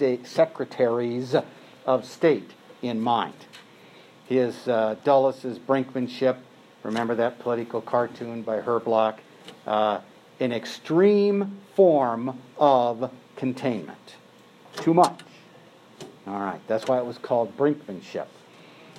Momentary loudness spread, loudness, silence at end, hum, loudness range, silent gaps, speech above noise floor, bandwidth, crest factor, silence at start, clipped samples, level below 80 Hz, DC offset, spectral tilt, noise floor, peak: 15 LU; -25 LUFS; 0.7 s; none; 5 LU; none; 28 dB; 13 kHz; 20 dB; 0 s; under 0.1%; -80 dBFS; under 0.1%; -6.5 dB/octave; -52 dBFS; -4 dBFS